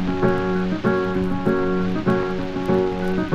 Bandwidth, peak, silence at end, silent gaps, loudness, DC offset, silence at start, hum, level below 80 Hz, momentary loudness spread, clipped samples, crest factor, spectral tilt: 7.8 kHz; -6 dBFS; 0 s; none; -22 LUFS; under 0.1%; 0 s; none; -38 dBFS; 2 LU; under 0.1%; 16 dB; -8 dB/octave